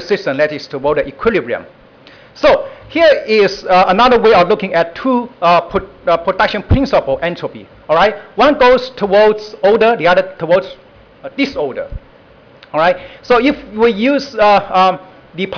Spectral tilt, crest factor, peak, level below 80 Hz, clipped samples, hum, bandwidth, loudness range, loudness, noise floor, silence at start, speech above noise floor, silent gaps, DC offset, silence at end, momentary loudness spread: -6 dB/octave; 10 dB; -4 dBFS; -34 dBFS; under 0.1%; none; 5.4 kHz; 5 LU; -13 LUFS; -43 dBFS; 0 s; 30 dB; none; under 0.1%; 0 s; 12 LU